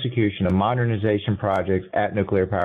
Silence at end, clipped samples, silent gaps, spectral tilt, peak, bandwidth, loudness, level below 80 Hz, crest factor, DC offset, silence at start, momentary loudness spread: 0 s; under 0.1%; none; -9 dB/octave; -8 dBFS; 4.1 kHz; -22 LUFS; -42 dBFS; 12 dB; under 0.1%; 0 s; 2 LU